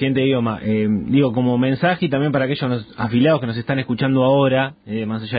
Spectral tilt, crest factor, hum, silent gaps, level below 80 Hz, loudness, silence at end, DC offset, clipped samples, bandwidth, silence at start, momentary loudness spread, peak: -12 dB/octave; 14 dB; none; none; -50 dBFS; -19 LUFS; 0 s; under 0.1%; under 0.1%; 5 kHz; 0 s; 8 LU; -4 dBFS